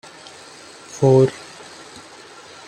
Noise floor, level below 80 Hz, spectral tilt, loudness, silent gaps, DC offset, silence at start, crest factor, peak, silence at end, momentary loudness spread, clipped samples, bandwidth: -42 dBFS; -58 dBFS; -7 dB/octave; -16 LUFS; none; under 0.1%; 0.95 s; 18 dB; -4 dBFS; 1.35 s; 25 LU; under 0.1%; 10.5 kHz